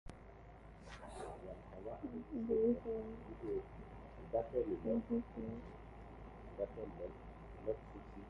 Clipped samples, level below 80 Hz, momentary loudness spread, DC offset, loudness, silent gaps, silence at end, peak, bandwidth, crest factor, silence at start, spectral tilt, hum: under 0.1%; -58 dBFS; 17 LU; under 0.1%; -43 LUFS; none; 0 s; -24 dBFS; 11 kHz; 18 dB; 0.05 s; -8.5 dB/octave; none